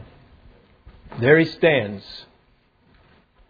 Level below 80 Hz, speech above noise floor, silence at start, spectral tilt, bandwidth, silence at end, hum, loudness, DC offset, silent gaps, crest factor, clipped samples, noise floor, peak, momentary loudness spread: -54 dBFS; 42 dB; 1.1 s; -8 dB/octave; 5 kHz; 1.3 s; none; -18 LUFS; under 0.1%; none; 22 dB; under 0.1%; -60 dBFS; -2 dBFS; 23 LU